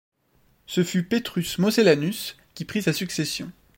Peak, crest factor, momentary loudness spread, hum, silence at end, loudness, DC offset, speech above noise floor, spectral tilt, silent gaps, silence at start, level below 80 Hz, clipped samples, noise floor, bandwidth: -4 dBFS; 20 dB; 13 LU; none; 0.25 s; -24 LUFS; under 0.1%; 40 dB; -5 dB/octave; none; 0.7 s; -58 dBFS; under 0.1%; -63 dBFS; 16.5 kHz